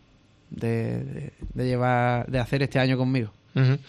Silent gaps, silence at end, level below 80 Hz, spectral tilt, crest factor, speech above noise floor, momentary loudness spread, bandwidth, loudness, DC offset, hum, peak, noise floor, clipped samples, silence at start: none; 0.05 s; -48 dBFS; -8 dB/octave; 16 dB; 33 dB; 12 LU; 10 kHz; -25 LUFS; under 0.1%; none; -10 dBFS; -58 dBFS; under 0.1%; 0.5 s